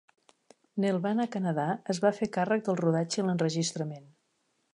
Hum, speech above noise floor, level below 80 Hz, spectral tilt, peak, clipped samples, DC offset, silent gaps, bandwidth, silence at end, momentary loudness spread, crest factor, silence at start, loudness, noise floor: none; 46 dB; -74 dBFS; -5.5 dB/octave; -12 dBFS; under 0.1%; under 0.1%; none; 11 kHz; 0.7 s; 7 LU; 18 dB; 0.75 s; -30 LUFS; -75 dBFS